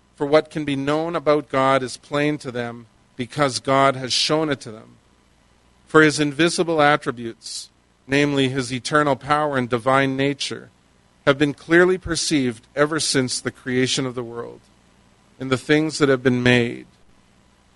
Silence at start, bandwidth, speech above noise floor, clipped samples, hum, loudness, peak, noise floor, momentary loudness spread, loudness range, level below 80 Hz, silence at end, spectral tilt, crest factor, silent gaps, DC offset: 0.2 s; 11.5 kHz; 37 dB; under 0.1%; none; -20 LUFS; 0 dBFS; -57 dBFS; 13 LU; 3 LU; -52 dBFS; 0.95 s; -4.5 dB/octave; 22 dB; none; under 0.1%